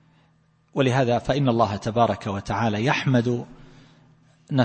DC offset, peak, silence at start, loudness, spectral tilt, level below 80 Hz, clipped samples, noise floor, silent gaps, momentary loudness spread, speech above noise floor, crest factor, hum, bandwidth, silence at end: under 0.1%; -6 dBFS; 0.75 s; -23 LUFS; -6.5 dB/octave; -52 dBFS; under 0.1%; -61 dBFS; none; 8 LU; 39 dB; 18 dB; none; 8.8 kHz; 0 s